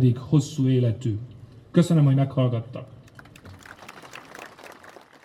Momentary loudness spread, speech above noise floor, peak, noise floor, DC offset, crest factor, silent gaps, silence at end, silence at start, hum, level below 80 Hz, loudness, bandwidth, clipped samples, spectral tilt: 25 LU; 27 dB; -6 dBFS; -48 dBFS; under 0.1%; 18 dB; none; 0.6 s; 0 s; none; -60 dBFS; -23 LUFS; 12 kHz; under 0.1%; -8 dB/octave